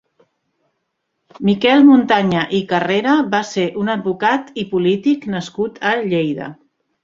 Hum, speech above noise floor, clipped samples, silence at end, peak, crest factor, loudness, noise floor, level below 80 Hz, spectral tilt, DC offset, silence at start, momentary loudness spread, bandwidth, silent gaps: none; 57 dB; under 0.1%; 0.5 s; 0 dBFS; 16 dB; -16 LUFS; -72 dBFS; -58 dBFS; -6 dB/octave; under 0.1%; 1.4 s; 12 LU; 7.6 kHz; none